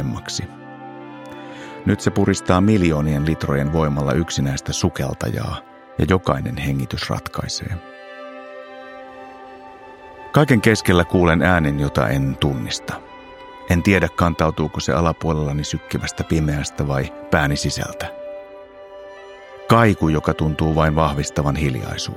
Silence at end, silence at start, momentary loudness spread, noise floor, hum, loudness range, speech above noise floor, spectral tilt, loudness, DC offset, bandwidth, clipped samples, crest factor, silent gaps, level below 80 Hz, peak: 0 s; 0 s; 22 LU; -40 dBFS; none; 6 LU; 21 dB; -6 dB/octave; -19 LUFS; under 0.1%; 16 kHz; under 0.1%; 20 dB; none; -36 dBFS; 0 dBFS